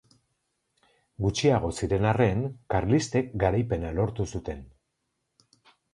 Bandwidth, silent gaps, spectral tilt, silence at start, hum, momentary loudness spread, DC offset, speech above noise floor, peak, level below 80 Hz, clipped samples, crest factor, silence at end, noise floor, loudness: 11.5 kHz; none; -6.5 dB/octave; 1.2 s; none; 9 LU; under 0.1%; 53 dB; -8 dBFS; -44 dBFS; under 0.1%; 20 dB; 1.25 s; -79 dBFS; -27 LUFS